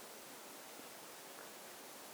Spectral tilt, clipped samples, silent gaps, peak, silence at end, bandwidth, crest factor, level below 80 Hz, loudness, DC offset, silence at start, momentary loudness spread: -1 dB/octave; under 0.1%; none; -38 dBFS; 0 s; over 20 kHz; 16 dB; under -90 dBFS; -52 LUFS; under 0.1%; 0 s; 0 LU